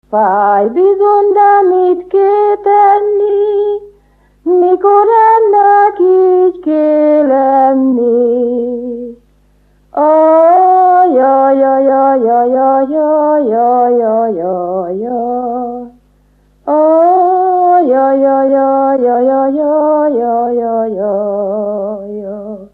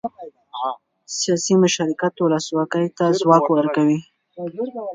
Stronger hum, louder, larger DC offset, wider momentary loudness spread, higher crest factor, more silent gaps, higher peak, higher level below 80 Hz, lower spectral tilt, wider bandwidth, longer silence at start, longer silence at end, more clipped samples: first, 50 Hz at -50 dBFS vs none; first, -10 LUFS vs -19 LUFS; neither; second, 10 LU vs 16 LU; second, 10 dB vs 20 dB; neither; about the same, 0 dBFS vs 0 dBFS; first, -52 dBFS vs -68 dBFS; first, -9 dB/octave vs -5 dB/octave; second, 4.3 kHz vs 9.6 kHz; about the same, 0.1 s vs 0.05 s; about the same, 0.05 s vs 0 s; neither